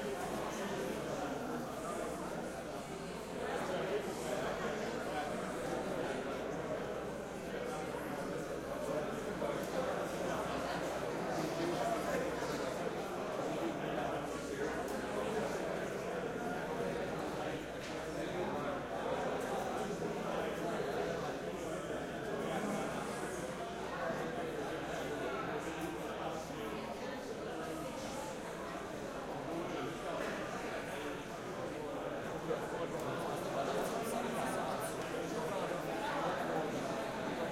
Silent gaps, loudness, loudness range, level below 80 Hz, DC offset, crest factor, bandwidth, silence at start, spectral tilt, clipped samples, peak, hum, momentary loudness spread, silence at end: none; -40 LUFS; 3 LU; -62 dBFS; under 0.1%; 14 dB; 16.5 kHz; 0 s; -5 dB/octave; under 0.1%; -24 dBFS; none; 5 LU; 0 s